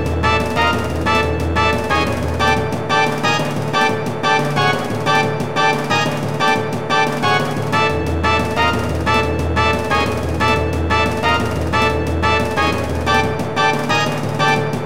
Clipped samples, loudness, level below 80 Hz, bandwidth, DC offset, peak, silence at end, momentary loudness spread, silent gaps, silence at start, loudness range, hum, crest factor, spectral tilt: under 0.1%; -17 LUFS; -32 dBFS; 16.5 kHz; 2%; -2 dBFS; 0 s; 3 LU; none; 0 s; 0 LU; none; 16 dB; -5 dB/octave